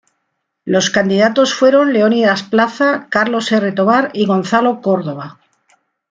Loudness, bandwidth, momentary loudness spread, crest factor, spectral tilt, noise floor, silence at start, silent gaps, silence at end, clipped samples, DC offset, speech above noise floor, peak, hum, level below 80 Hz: -14 LUFS; 9 kHz; 7 LU; 14 dB; -4.5 dB/octave; -71 dBFS; 0.65 s; none; 0.8 s; under 0.1%; under 0.1%; 58 dB; -2 dBFS; none; -60 dBFS